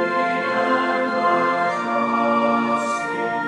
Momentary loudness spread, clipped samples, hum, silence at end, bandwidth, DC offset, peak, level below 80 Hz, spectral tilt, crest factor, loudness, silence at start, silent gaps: 3 LU; under 0.1%; none; 0 s; 11.5 kHz; under 0.1%; -6 dBFS; -72 dBFS; -5 dB/octave; 14 dB; -20 LUFS; 0 s; none